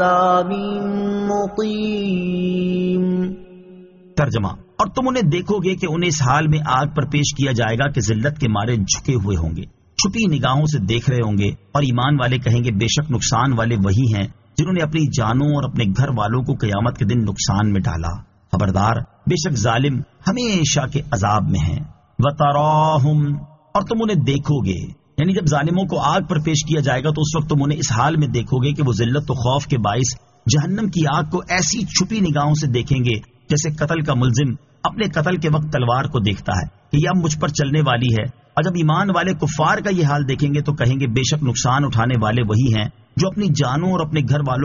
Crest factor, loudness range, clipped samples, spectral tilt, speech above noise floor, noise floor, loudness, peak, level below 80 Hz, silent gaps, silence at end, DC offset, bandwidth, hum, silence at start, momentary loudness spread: 14 dB; 2 LU; under 0.1%; -5.5 dB/octave; 25 dB; -43 dBFS; -19 LUFS; -4 dBFS; -40 dBFS; none; 0 s; under 0.1%; 7.4 kHz; none; 0 s; 5 LU